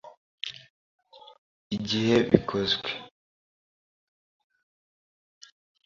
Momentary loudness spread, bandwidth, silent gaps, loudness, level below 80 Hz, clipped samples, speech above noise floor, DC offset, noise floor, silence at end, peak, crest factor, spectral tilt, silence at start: 16 LU; 7.6 kHz; 0.17-0.38 s, 0.70-0.99 s, 1.38-1.70 s; -27 LUFS; -60 dBFS; under 0.1%; over 66 dB; under 0.1%; under -90 dBFS; 2.8 s; -2 dBFS; 30 dB; -5.5 dB/octave; 0.05 s